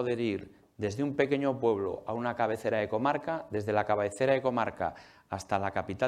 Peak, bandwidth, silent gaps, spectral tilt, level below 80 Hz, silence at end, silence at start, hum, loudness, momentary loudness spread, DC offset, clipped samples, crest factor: -12 dBFS; 13 kHz; none; -6.5 dB/octave; -66 dBFS; 0 s; 0 s; none; -31 LUFS; 8 LU; under 0.1%; under 0.1%; 18 dB